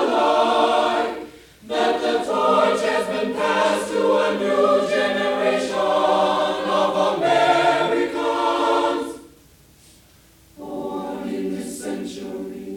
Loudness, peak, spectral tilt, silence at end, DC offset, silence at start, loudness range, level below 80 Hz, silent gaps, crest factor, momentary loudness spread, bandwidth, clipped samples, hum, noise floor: -20 LUFS; -6 dBFS; -4 dB/octave; 0 s; under 0.1%; 0 s; 9 LU; -58 dBFS; none; 16 dB; 12 LU; 17 kHz; under 0.1%; none; -52 dBFS